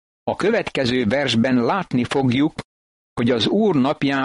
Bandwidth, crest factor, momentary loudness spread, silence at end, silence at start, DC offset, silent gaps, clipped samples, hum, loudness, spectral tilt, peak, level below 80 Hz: 11 kHz; 12 dB; 6 LU; 0 s; 0.25 s; under 0.1%; 2.64-3.16 s; under 0.1%; none; -19 LUFS; -6 dB/octave; -8 dBFS; -52 dBFS